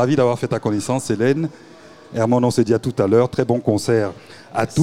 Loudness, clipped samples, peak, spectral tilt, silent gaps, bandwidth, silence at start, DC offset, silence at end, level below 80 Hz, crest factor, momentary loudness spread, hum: -19 LUFS; under 0.1%; -4 dBFS; -6.5 dB/octave; none; 15 kHz; 0 s; 0.4%; 0 s; -54 dBFS; 16 dB; 10 LU; none